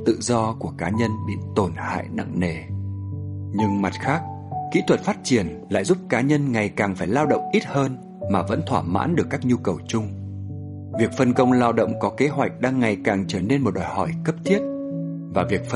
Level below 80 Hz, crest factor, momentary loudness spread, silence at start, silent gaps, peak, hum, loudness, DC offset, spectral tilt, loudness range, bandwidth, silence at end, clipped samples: -52 dBFS; 18 dB; 10 LU; 0 s; none; -4 dBFS; none; -23 LUFS; under 0.1%; -6.5 dB/octave; 4 LU; 11.5 kHz; 0 s; under 0.1%